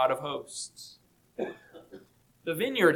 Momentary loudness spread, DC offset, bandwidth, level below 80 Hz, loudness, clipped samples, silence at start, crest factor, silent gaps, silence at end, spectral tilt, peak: 22 LU; under 0.1%; 18 kHz; -72 dBFS; -33 LUFS; under 0.1%; 0 s; 22 dB; none; 0 s; -4 dB/octave; -10 dBFS